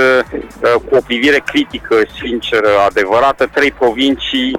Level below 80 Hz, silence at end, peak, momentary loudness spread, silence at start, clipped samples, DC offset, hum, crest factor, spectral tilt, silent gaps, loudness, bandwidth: -40 dBFS; 0 s; -2 dBFS; 5 LU; 0 s; under 0.1%; under 0.1%; none; 10 dB; -4 dB/octave; none; -13 LUFS; 16 kHz